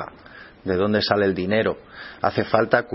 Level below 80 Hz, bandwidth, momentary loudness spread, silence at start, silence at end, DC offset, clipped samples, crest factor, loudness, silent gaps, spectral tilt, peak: -54 dBFS; 5.8 kHz; 15 LU; 0 s; 0 s; under 0.1%; under 0.1%; 22 dB; -21 LUFS; none; -9.5 dB/octave; 0 dBFS